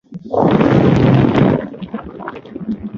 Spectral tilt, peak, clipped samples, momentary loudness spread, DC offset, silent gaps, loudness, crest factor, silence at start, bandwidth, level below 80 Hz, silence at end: -9 dB/octave; 0 dBFS; under 0.1%; 17 LU; under 0.1%; none; -13 LUFS; 14 dB; 0.1 s; 7.2 kHz; -36 dBFS; 0 s